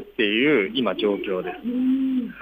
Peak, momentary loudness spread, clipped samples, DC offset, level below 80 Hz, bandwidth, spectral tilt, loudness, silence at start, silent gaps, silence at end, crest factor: -10 dBFS; 9 LU; under 0.1%; under 0.1%; -60 dBFS; 4.9 kHz; -7.5 dB/octave; -22 LUFS; 0 s; none; 0 s; 14 dB